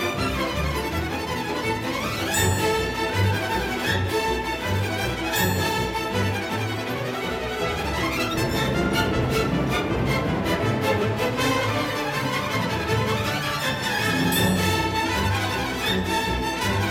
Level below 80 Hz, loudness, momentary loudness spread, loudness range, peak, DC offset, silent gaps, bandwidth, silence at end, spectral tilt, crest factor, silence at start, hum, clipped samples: -38 dBFS; -24 LUFS; 4 LU; 2 LU; -8 dBFS; under 0.1%; none; 17 kHz; 0 s; -4.5 dB/octave; 14 dB; 0 s; none; under 0.1%